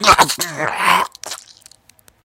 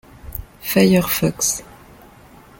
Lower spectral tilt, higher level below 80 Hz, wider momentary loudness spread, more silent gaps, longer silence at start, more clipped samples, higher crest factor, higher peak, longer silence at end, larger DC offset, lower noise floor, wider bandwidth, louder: second, -1.5 dB/octave vs -4.5 dB/octave; about the same, -44 dBFS vs -42 dBFS; about the same, 18 LU vs 19 LU; neither; second, 0 s vs 0.25 s; neither; about the same, 18 dB vs 18 dB; about the same, 0 dBFS vs -2 dBFS; about the same, 0.9 s vs 0.95 s; neither; first, -52 dBFS vs -45 dBFS; about the same, 17 kHz vs 17 kHz; first, -15 LUFS vs -18 LUFS